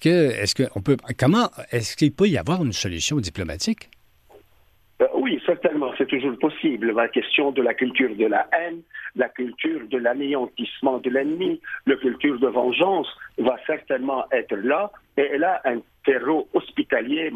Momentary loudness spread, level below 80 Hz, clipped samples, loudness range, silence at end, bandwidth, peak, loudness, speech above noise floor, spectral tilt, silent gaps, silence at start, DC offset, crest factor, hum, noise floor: 6 LU; -54 dBFS; under 0.1%; 3 LU; 0 s; 15 kHz; -8 dBFS; -23 LUFS; 35 dB; -5 dB/octave; none; 0 s; under 0.1%; 16 dB; none; -57 dBFS